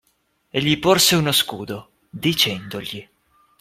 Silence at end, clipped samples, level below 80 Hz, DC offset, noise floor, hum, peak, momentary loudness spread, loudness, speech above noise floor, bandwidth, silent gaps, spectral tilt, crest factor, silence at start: 0.6 s; under 0.1%; -54 dBFS; under 0.1%; -67 dBFS; none; -2 dBFS; 19 LU; -18 LUFS; 47 dB; 16.5 kHz; none; -3 dB/octave; 20 dB; 0.55 s